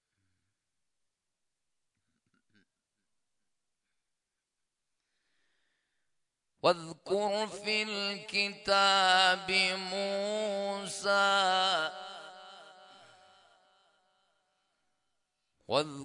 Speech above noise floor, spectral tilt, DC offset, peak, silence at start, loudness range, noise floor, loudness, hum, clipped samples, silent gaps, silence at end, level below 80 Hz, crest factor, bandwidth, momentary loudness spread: 57 dB; -2 dB/octave; under 0.1%; -12 dBFS; 6.65 s; 11 LU; -87 dBFS; -29 LUFS; none; under 0.1%; none; 0 s; -78 dBFS; 22 dB; 11 kHz; 11 LU